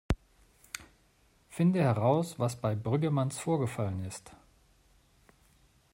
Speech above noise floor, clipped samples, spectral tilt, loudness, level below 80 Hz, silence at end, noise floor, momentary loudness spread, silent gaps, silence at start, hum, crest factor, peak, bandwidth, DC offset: 37 dB; under 0.1%; -7 dB/octave; -31 LUFS; -50 dBFS; 1.6 s; -66 dBFS; 18 LU; none; 0.1 s; none; 20 dB; -14 dBFS; 16 kHz; under 0.1%